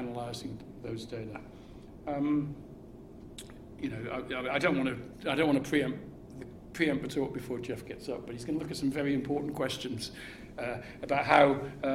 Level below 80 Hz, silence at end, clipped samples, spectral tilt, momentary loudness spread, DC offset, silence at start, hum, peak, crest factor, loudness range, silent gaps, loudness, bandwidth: -58 dBFS; 0 s; under 0.1%; -5.5 dB/octave; 19 LU; under 0.1%; 0 s; none; -6 dBFS; 28 dB; 7 LU; none; -32 LUFS; 15.5 kHz